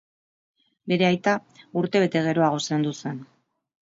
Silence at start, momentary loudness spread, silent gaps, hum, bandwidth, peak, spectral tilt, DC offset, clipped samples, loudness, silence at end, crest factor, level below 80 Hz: 0.85 s; 13 LU; none; none; 7.8 kHz; -6 dBFS; -5.5 dB/octave; under 0.1%; under 0.1%; -24 LUFS; 0.75 s; 18 dB; -70 dBFS